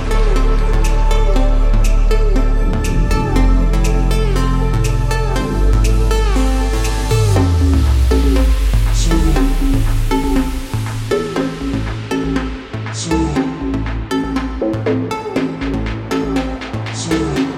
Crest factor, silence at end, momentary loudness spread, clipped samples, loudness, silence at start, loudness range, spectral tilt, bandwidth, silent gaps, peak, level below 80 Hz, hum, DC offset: 12 dB; 0 s; 7 LU; under 0.1%; -17 LUFS; 0 s; 5 LU; -6 dB/octave; 14 kHz; none; -2 dBFS; -16 dBFS; none; under 0.1%